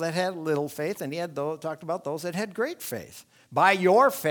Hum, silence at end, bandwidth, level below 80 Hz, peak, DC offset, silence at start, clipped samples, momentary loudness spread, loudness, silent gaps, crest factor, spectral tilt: none; 0 s; 19.5 kHz; -72 dBFS; -6 dBFS; under 0.1%; 0 s; under 0.1%; 14 LU; -26 LUFS; none; 20 dB; -5 dB/octave